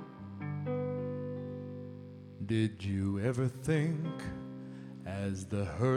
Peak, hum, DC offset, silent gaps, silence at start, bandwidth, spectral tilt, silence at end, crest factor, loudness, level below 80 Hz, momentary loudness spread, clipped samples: -18 dBFS; none; under 0.1%; none; 0 s; 13 kHz; -7.5 dB/octave; 0 s; 18 dB; -36 LUFS; -60 dBFS; 14 LU; under 0.1%